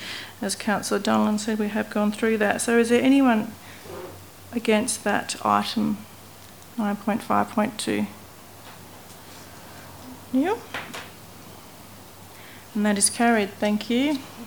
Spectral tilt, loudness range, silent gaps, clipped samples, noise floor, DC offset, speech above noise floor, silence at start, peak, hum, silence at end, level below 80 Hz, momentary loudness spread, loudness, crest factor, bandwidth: -4 dB/octave; 10 LU; none; under 0.1%; -45 dBFS; 0.2%; 23 dB; 0 s; -4 dBFS; none; 0 s; -64 dBFS; 24 LU; -23 LUFS; 22 dB; over 20 kHz